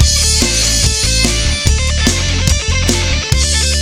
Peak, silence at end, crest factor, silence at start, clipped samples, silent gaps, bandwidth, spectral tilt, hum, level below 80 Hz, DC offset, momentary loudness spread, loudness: 0 dBFS; 0 s; 12 dB; 0 s; under 0.1%; none; 17 kHz; -2.5 dB/octave; none; -16 dBFS; under 0.1%; 3 LU; -12 LUFS